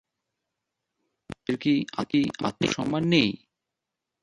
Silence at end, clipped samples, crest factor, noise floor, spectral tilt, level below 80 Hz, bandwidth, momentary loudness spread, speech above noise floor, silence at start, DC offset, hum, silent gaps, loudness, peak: 0.85 s; under 0.1%; 22 dB; -86 dBFS; -5.5 dB/octave; -60 dBFS; 11 kHz; 13 LU; 61 dB; 1.3 s; under 0.1%; none; none; -26 LUFS; -6 dBFS